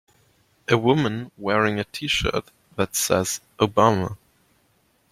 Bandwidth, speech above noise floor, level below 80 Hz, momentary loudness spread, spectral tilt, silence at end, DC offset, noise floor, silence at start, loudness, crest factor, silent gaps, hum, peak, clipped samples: 16.5 kHz; 42 dB; -48 dBFS; 12 LU; -4 dB/octave; 0.95 s; under 0.1%; -64 dBFS; 0.7 s; -22 LUFS; 22 dB; none; none; -2 dBFS; under 0.1%